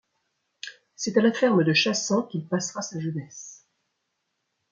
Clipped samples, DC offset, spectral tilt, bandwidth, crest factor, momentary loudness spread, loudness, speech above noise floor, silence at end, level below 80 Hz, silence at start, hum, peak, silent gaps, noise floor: under 0.1%; under 0.1%; -4.5 dB/octave; 7.6 kHz; 20 dB; 20 LU; -24 LUFS; 54 dB; 1.2 s; -74 dBFS; 0.65 s; none; -8 dBFS; none; -78 dBFS